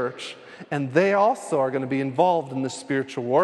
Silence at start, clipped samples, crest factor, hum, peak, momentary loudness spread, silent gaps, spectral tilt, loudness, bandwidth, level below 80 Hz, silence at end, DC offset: 0 s; under 0.1%; 18 dB; none; -6 dBFS; 11 LU; none; -6 dB/octave; -23 LUFS; 12 kHz; -72 dBFS; 0 s; under 0.1%